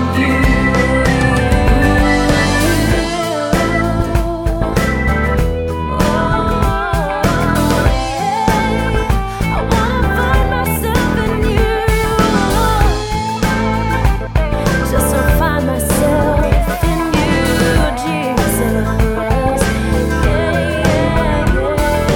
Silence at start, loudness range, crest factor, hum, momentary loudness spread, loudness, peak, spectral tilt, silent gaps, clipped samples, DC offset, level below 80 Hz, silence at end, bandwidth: 0 s; 2 LU; 14 dB; none; 4 LU; -14 LUFS; 0 dBFS; -5.5 dB/octave; none; under 0.1%; under 0.1%; -20 dBFS; 0 s; 18 kHz